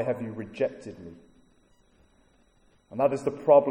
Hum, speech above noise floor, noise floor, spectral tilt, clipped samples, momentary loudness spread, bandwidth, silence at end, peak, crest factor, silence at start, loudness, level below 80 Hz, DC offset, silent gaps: none; 37 dB; -63 dBFS; -7.5 dB/octave; under 0.1%; 23 LU; 9.8 kHz; 0 s; -6 dBFS; 22 dB; 0 s; -27 LUFS; -66 dBFS; under 0.1%; none